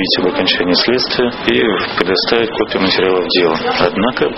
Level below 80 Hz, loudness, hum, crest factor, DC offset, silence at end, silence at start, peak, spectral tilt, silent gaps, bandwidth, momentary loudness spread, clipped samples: -42 dBFS; -13 LUFS; none; 14 dB; under 0.1%; 0 s; 0 s; 0 dBFS; -2 dB/octave; none; 6 kHz; 3 LU; under 0.1%